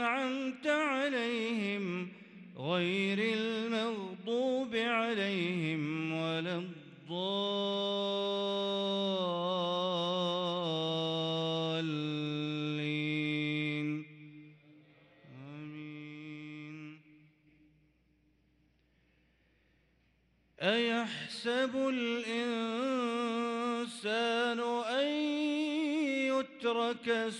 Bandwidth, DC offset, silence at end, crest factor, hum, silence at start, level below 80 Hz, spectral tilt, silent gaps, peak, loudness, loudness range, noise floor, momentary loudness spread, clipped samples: 11.5 kHz; under 0.1%; 0 s; 16 dB; none; 0 s; -80 dBFS; -5.5 dB/octave; none; -18 dBFS; -33 LUFS; 16 LU; -71 dBFS; 14 LU; under 0.1%